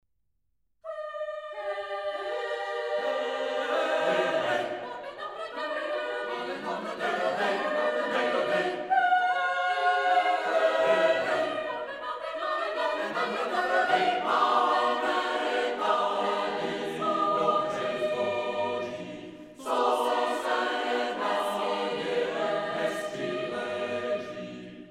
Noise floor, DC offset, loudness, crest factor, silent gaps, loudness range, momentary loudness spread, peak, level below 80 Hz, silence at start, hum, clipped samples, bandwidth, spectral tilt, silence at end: -78 dBFS; under 0.1%; -28 LUFS; 16 dB; none; 5 LU; 11 LU; -12 dBFS; -72 dBFS; 0.85 s; none; under 0.1%; 15 kHz; -3.5 dB/octave; 0 s